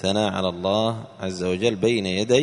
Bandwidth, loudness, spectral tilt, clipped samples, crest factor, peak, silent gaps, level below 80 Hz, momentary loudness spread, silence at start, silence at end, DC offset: 11 kHz; -23 LUFS; -5 dB/octave; under 0.1%; 18 dB; -4 dBFS; none; -56 dBFS; 7 LU; 0 s; 0 s; under 0.1%